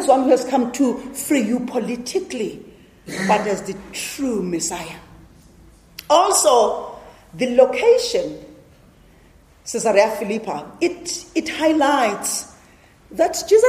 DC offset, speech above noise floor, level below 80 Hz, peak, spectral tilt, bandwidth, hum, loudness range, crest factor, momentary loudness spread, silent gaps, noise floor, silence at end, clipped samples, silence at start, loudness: under 0.1%; 32 dB; -54 dBFS; 0 dBFS; -3.5 dB/octave; 15.5 kHz; none; 6 LU; 20 dB; 17 LU; none; -50 dBFS; 0 s; under 0.1%; 0 s; -19 LUFS